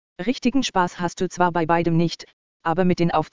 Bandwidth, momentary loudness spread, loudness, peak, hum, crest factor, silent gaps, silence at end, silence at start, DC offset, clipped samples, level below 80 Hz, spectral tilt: 7.6 kHz; 7 LU; -22 LUFS; -4 dBFS; none; 18 dB; 2.33-2.60 s; 0 s; 0.15 s; 1%; under 0.1%; -50 dBFS; -6 dB/octave